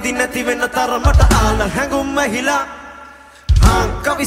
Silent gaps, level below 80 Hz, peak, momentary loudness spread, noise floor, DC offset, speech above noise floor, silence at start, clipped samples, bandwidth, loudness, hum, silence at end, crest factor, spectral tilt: none; -18 dBFS; 0 dBFS; 11 LU; -39 dBFS; under 0.1%; 25 dB; 0 s; under 0.1%; 16 kHz; -15 LUFS; none; 0 s; 14 dB; -5 dB/octave